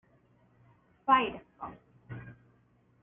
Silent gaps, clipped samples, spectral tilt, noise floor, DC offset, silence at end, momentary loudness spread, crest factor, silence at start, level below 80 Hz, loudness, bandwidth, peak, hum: none; under 0.1%; -0.5 dB/octave; -67 dBFS; under 0.1%; 0.7 s; 21 LU; 26 dB; 1.05 s; -66 dBFS; -28 LUFS; 3.6 kHz; -10 dBFS; none